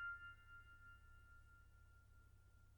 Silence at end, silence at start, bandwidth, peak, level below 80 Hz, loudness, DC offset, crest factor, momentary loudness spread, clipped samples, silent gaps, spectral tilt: 0 s; 0 s; 19 kHz; -42 dBFS; -68 dBFS; -61 LUFS; under 0.1%; 16 dB; 14 LU; under 0.1%; none; -4 dB/octave